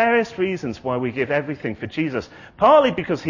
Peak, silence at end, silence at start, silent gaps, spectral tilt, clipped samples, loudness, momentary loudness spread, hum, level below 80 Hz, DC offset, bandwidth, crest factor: -2 dBFS; 0 s; 0 s; none; -6.5 dB/octave; under 0.1%; -21 LUFS; 14 LU; none; -52 dBFS; under 0.1%; 7.4 kHz; 18 dB